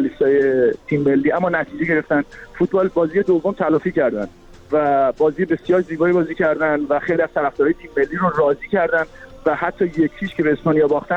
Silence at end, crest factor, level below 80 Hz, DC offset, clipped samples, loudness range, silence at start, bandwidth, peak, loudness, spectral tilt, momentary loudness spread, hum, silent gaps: 0 s; 14 dB; -48 dBFS; under 0.1%; under 0.1%; 1 LU; 0 s; 7.8 kHz; -4 dBFS; -18 LUFS; -8.5 dB/octave; 5 LU; none; none